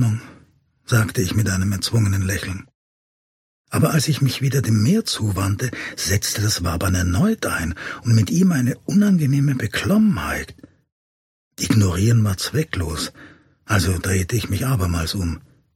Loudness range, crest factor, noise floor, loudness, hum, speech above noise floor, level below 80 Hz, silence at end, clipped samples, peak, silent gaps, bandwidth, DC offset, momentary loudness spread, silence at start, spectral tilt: 3 LU; 18 dB; -56 dBFS; -20 LUFS; none; 37 dB; -40 dBFS; 0.4 s; under 0.1%; -2 dBFS; 2.75-3.64 s, 10.92-11.51 s; 16.5 kHz; under 0.1%; 9 LU; 0 s; -5 dB/octave